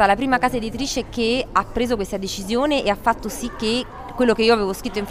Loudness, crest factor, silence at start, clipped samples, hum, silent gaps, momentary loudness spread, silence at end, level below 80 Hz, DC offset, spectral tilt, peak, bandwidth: -21 LUFS; 18 dB; 0 s; under 0.1%; none; none; 8 LU; 0 s; -38 dBFS; under 0.1%; -4 dB/octave; -2 dBFS; 16 kHz